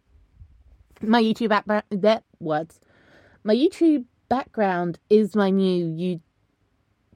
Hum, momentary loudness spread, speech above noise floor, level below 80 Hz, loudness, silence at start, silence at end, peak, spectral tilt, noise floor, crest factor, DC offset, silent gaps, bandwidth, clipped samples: none; 9 LU; 46 dB; -60 dBFS; -22 LUFS; 1 s; 0.95 s; -6 dBFS; -7 dB/octave; -67 dBFS; 18 dB; under 0.1%; none; 11 kHz; under 0.1%